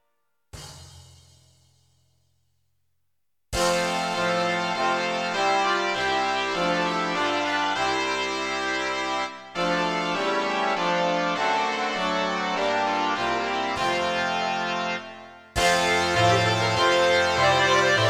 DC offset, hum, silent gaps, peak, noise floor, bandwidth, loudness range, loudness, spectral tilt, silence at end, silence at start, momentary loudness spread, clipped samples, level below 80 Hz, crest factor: under 0.1%; none; none; -8 dBFS; -82 dBFS; 16 kHz; 5 LU; -23 LUFS; -3.5 dB/octave; 0 s; 0.55 s; 7 LU; under 0.1%; -52 dBFS; 18 dB